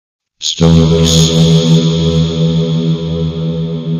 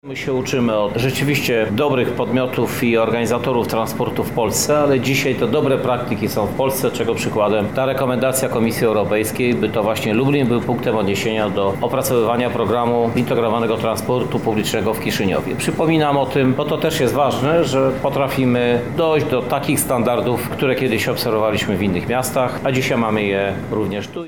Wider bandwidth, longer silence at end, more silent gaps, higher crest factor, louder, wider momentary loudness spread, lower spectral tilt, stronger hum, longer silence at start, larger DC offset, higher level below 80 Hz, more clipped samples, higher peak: second, 11 kHz vs 19.5 kHz; about the same, 0 s vs 0 s; neither; about the same, 10 dB vs 12 dB; first, -11 LUFS vs -18 LUFS; first, 9 LU vs 4 LU; about the same, -6 dB/octave vs -5 dB/octave; neither; first, 0.4 s vs 0.05 s; second, under 0.1% vs 0.7%; first, -28 dBFS vs -46 dBFS; neither; first, 0 dBFS vs -6 dBFS